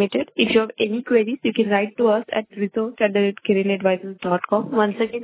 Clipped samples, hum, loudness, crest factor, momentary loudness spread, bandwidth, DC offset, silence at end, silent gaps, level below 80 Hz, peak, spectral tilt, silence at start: under 0.1%; none; -21 LUFS; 18 dB; 6 LU; 4 kHz; under 0.1%; 0 s; none; -62 dBFS; -4 dBFS; -10 dB/octave; 0 s